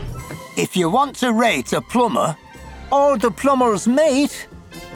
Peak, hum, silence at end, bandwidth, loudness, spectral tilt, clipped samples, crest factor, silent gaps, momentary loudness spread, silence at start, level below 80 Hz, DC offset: -4 dBFS; none; 0 s; 18.5 kHz; -18 LUFS; -4.5 dB/octave; under 0.1%; 14 dB; none; 18 LU; 0 s; -44 dBFS; under 0.1%